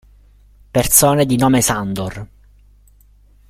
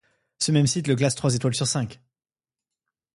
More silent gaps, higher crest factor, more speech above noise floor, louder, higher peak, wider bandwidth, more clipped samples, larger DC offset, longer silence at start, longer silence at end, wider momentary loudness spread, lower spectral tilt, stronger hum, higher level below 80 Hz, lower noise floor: neither; about the same, 18 dB vs 18 dB; second, 34 dB vs 66 dB; first, -14 LUFS vs -23 LUFS; first, 0 dBFS vs -8 dBFS; first, 16.5 kHz vs 11.5 kHz; neither; neither; first, 0.75 s vs 0.4 s; about the same, 1.25 s vs 1.2 s; first, 15 LU vs 7 LU; about the same, -4 dB/octave vs -4.5 dB/octave; first, 50 Hz at -40 dBFS vs none; first, -40 dBFS vs -58 dBFS; second, -49 dBFS vs -89 dBFS